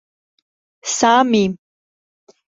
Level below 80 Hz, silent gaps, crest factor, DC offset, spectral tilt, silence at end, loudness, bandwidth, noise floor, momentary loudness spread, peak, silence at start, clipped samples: -60 dBFS; none; 18 dB; under 0.1%; -3.5 dB/octave; 0.95 s; -16 LUFS; 8 kHz; under -90 dBFS; 16 LU; -2 dBFS; 0.85 s; under 0.1%